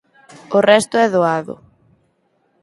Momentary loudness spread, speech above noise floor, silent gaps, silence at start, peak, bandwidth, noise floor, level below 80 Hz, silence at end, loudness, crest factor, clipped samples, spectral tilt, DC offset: 18 LU; 48 dB; none; 0.5 s; 0 dBFS; 11.5 kHz; -63 dBFS; -62 dBFS; 1.1 s; -15 LUFS; 18 dB; under 0.1%; -4.5 dB/octave; under 0.1%